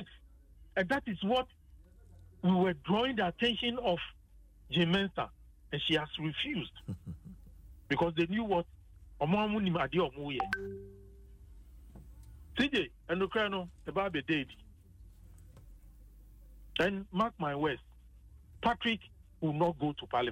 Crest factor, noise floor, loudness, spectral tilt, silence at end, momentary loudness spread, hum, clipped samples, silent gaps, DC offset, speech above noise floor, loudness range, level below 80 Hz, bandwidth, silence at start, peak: 18 dB; -58 dBFS; -33 LUFS; -6.5 dB/octave; 0 s; 14 LU; none; under 0.1%; none; under 0.1%; 26 dB; 5 LU; -56 dBFS; 11.5 kHz; 0 s; -18 dBFS